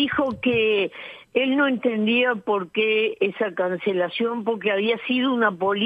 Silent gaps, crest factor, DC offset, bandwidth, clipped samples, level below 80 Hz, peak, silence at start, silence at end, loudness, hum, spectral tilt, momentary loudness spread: none; 16 dB; under 0.1%; 5 kHz; under 0.1%; -62 dBFS; -6 dBFS; 0 s; 0 s; -22 LUFS; none; -7 dB/octave; 5 LU